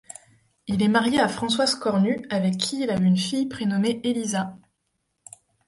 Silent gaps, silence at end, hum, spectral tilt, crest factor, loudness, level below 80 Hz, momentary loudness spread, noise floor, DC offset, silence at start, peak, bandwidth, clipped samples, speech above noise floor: none; 1.1 s; none; -5 dB/octave; 18 dB; -23 LUFS; -60 dBFS; 9 LU; -75 dBFS; under 0.1%; 0.65 s; -6 dBFS; 11.5 kHz; under 0.1%; 53 dB